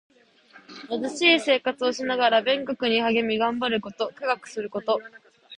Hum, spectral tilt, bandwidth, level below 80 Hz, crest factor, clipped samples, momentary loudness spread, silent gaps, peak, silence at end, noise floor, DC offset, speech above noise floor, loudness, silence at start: none; -3.5 dB/octave; 11 kHz; -68 dBFS; 20 dB; under 0.1%; 11 LU; none; -4 dBFS; 0.05 s; -54 dBFS; under 0.1%; 30 dB; -24 LUFS; 0.55 s